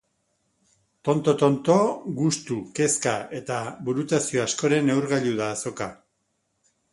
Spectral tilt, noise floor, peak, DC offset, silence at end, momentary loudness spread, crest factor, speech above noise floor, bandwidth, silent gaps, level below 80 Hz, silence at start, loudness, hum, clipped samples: -5 dB/octave; -74 dBFS; -6 dBFS; under 0.1%; 1 s; 10 LU; 20 dB; 50 dB; 11.5 kHz; none; -64 dBFS; 1.05 s; -24 LUFS; none; under 0.1%